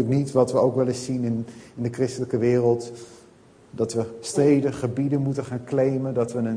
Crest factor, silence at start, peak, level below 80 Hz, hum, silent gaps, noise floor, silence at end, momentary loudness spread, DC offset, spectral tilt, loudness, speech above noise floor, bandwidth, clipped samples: 18 dB; 0 s; -6 dBFS; -60 dBFS; none; none; -52 dBFS; 0 s; 11 LU; under 0.1%; -7 dB/octave; -24 LUFS; 29 dB; 10.5 kHz; under 0.1%